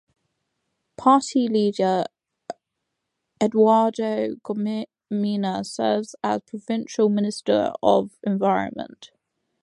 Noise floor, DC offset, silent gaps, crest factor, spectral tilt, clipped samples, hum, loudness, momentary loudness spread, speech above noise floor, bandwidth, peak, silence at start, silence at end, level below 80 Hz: -80 dBFS; under 0.1%; none; 20 dB; -6 dB/octave; under 0.1%; none; -22 LUFS; 13 LU; 59 dB; 11.5 kHz; -4 dBFS; 1 s; 0.55 s; -68 dBFS